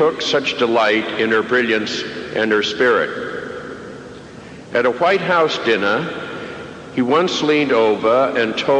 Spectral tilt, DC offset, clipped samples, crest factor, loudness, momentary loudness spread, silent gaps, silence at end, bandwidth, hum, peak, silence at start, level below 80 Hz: -4.5 dB/octave; under 0.1%; under 0.1%; 12 dB; -17 LUFS; 16 LU; none; 0 s; 9.8 kHz; none; -6 dBFS; 0 s; -56 dBFS